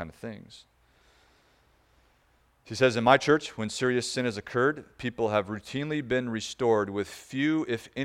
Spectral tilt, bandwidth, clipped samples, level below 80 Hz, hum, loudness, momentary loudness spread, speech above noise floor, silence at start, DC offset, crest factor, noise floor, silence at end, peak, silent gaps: -5 dB/octave; 15 kHz; under 0.1%; -62 dBFS; none; -27 LUFS; 14 LU; 38 dB; 0 s; under 0.1%; 24 dB; -66 dBFS; 0 s; -6 dBFS; none